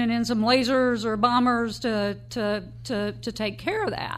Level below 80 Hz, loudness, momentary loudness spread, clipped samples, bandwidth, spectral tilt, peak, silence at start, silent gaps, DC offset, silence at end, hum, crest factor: -52 dBFS; -25 LUFS; 9 LU; under 0.1%; 14.5 kHz; -5 dB/octave; -6 dBFS; 0 s; none; under 0.1%; 0 s; none; 18 dB